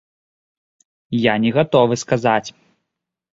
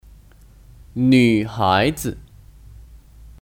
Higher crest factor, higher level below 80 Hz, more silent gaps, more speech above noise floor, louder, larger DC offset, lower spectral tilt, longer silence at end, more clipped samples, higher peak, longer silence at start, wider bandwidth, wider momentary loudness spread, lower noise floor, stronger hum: about the same, 18 dB vs 18 dB; second, -56 dBFS vs -44 dBFS; neither; first, 64 dB vs 30 dB; about the same, -17 LUFS vs -18 LUFS; neither; about the same, -5.5 dB/octave vs -6 dB/octave; first, 0.8 s vs 0.5 s; neither; about the same, -2 dBFS vs -4 dBFS; first, 1.1 s vs 0.95 s; second, 7.8 kHz vs 17 kHz; second, 8 LU vs 17 LU; first, -81 dBFS vs -47 dBFS; neither